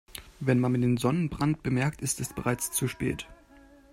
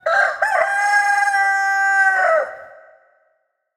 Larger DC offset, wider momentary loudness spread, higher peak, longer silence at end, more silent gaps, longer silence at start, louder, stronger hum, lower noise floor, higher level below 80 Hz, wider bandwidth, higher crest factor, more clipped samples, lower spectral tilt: neither; first, 8 LU vs 3 LU; second, -10 dBFS vs -4 dBFS; second, 0.6 s vs 1.05 s; neither; about the same, 0.15 s vs 0.05 s; second, -28 LUFS vs -16 LUFS; neither; second, -55 dBFS vs -67 dBFS; first, -52 dBFS vs -72 dBFS; about the same, 16 kHz vs 15.5 kHz; about the same, 18 dB vs 14 dB; neither; first, -5.5 dB/octave vs 1 dB/octave